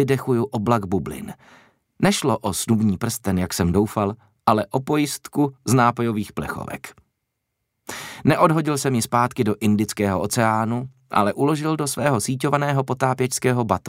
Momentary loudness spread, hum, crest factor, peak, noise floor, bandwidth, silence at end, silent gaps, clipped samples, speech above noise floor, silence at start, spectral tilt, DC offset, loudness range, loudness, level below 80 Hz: 11 LU; none; 18 dB; -2 dBFS; -77 dBFS; 16 kHz; 0 s; none; under 0.1%; 57 dB; 0 s; -5.5 dB/octave; under 0.1%; 3 LU; -21 LUFS; -50 dBFS